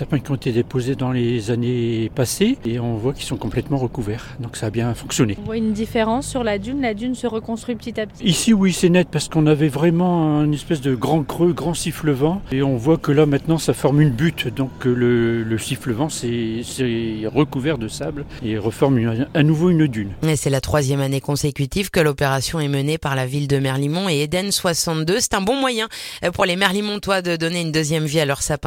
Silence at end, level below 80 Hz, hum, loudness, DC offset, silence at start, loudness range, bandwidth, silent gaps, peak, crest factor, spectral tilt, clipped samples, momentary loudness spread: 0 s; -42 dBFS; none; -20 LUFS; under 0.1%; 0 s; 4 LU; 17 kHz; none; -2 dBFS; 18 dB; -5.5 dB/octave; under 0.1%; 8 LU